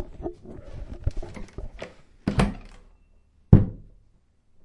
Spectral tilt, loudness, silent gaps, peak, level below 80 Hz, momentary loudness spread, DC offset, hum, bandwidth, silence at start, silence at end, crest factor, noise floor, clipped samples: -8 dB/octave; -25 LUFS; none; 0 dBFS; -34 dBFS; 24 LU; under 0.1%; none; 11 kHz; 0 s; 0.9 s; 26 dB; -60 dBFS; under 0.1%